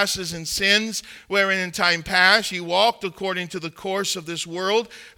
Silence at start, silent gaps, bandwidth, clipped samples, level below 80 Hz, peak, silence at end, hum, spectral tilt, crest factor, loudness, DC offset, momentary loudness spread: 0 s; none; 19 kHz; under 0.1%; -54 dBFS; -2 dBFS; 0.1 s; none; -2 dB/octave; 20 dB; -21 LUFS; under 0.1%; 12 LU